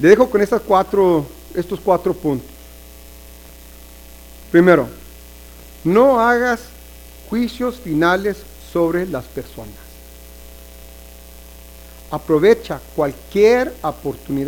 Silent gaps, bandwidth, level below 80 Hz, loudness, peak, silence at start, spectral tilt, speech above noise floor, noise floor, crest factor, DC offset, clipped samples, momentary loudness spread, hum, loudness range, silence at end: none; 19 kHz; -42 dBFS; -17 LUFS; 0 dBFS; 0 s; -6.5 dB/octave; 24 dB; -39 dBFS; 18 dB; under 0.1%; under 0.1%; 16 LU; none; 9 LU; 0 s